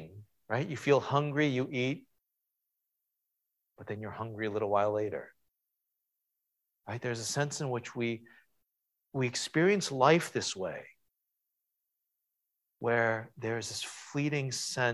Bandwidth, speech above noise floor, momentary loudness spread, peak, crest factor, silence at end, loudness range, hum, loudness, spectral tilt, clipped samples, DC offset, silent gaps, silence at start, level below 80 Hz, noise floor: 14.5 kHz; 54 dB; 14 LU; -10 dBFS; 24 dB; 0 s; 7 LU; none; -32 LUFS; -4.5 dB/octave; under 0.1%; under 0.1%; none; 0 s; -72 dBFS; -85 dBFS